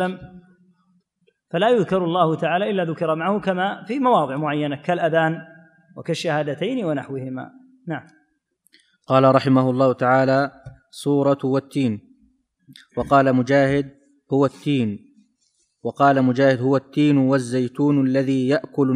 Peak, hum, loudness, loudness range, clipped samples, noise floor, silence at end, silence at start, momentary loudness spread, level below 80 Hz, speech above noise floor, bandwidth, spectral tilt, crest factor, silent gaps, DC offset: -2 dBFS; none; -20 LUFS; 5 LU; under 0.1%; -67 dBFS; 0 s; 0 s; 15 LU; -58 dBFS; 48 dB; 11 kHz; -7 dB/octave; 18 dB; none; under 0.1%